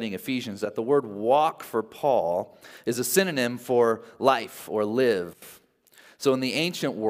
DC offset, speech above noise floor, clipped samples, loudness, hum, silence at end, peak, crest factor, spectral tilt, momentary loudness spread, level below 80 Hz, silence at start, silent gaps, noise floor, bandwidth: under 0.1%; 31 dB; under 0.1%; -25 LUFS; none; 0 s; -4 dBFS; 20 dB; -4 dB/octave; 8 LU; -76 dBFS; 0 s; none; -56 dBFS; 16 kHz